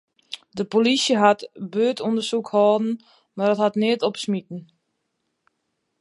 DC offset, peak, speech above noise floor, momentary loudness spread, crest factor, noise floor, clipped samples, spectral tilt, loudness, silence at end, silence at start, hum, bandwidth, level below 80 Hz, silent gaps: under 0.1%; -2 dBFS; 54 dB; 18 LU; 20 dB; -76 dBFS; under 0.1%; -4.5 dB/octave; -21 LUFS; 1.35 s; 0.3 s; none; 11.5 kHz; -74 dBFS; none